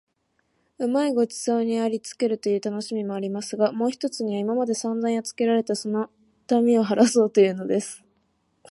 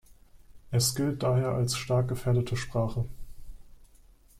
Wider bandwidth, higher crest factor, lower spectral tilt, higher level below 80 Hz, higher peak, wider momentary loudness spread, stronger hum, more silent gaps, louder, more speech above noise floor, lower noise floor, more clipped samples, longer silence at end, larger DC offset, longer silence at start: second, 11.5 kHz vs 15.5 kHz; about the same, 20 dB vs 16 dB; about the same, -5 dB/octave vs -5 dB/octave; second, -74 dBFS vs -48 dBFS; first, -4 dBFS vs -14 dBFS; first, 10 LU vs 5 LU; neither; neither; first, -24 LUFS vs -29 LUFS; first, 48 dB vs 29 dB; first, -71 dBFS vs -57 dBFS; neither; first, 0.75 s vs 0.55 s; neither; first, 0.8 s vs 0.1 s